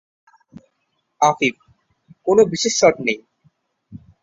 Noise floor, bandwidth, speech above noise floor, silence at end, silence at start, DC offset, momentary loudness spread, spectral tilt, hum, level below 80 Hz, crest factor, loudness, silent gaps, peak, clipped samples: -71 dBFS; 7.8 kHz; 55 dB; 0.25 s; 1.2 s; under 0.1%; 9 LU; -3.5 dB/octave; none; -60 dBFS; 20 dB; -18 LUFS; none; -2 dBFS; under 0.1%